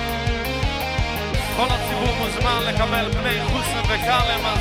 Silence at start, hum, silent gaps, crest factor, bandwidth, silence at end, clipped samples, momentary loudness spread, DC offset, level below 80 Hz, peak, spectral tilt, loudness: 0 s; none; none; 16 dB; 16.5 kHz; 0 s; under 0.1%; 5 LU; under 0.1%; -28 dBFS; -6 dBFS; -4.5 dB/octave; -21 LUFS